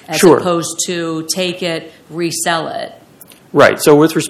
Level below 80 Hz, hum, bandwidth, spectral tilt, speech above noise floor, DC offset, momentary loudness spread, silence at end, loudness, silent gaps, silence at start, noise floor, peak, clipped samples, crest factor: -54 dBFS; none; 16 kHz; -4 dB/octave; 29 dB; under 0.1%; 15 LU; 0 s; -14 LUFS; none; 0.1 s; -42 dBFS; 0 dBFS; 0.7%; 14 dB